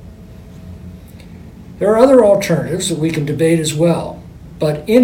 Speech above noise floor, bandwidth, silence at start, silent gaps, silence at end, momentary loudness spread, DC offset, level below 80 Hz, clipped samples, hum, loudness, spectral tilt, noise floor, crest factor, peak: 23 dB; 17 kHz; 0 s; none; 0 s; 25 LU; under 0.1%; -42 dBFS; under 0.1%; none; -14 LUFS; -6 dB/octave; -36 dBFS; 16 dB; 0 dBFS